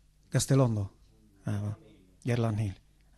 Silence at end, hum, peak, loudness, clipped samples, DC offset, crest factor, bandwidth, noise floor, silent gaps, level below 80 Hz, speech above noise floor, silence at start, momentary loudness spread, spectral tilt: 0.45 s; none; -14 dBFS; -31 LUFS; under 0.1%; under 0.1%; 16 dB; 13 kHz; -60 dBFS; none; -56 dBFS; 32 dB; 0.3 s; 16 LU; -6 dB/octave